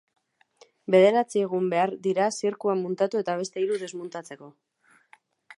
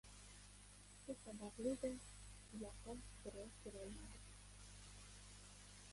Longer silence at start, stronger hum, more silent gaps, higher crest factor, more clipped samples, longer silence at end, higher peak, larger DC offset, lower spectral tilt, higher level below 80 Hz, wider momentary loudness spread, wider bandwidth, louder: first, 0.9 s vs 0.05 s; second, none vs 50 Hz at -65 dBFS; neither; about the same, 20 dB vs 20 dB; neither; first, 1.05 s vs 0 s; first, -8 dBFS vs -32 dBFS; neither; about the same, -5.5 dB/octave vs -4.5 dB/octave; second, -82 dBFS vs -64 dBFS; first, 19 LU vs 13 LU; about the same, 11.5 kHz vs 11.5 kHz; first, -25 LUFS vs -54 LUFS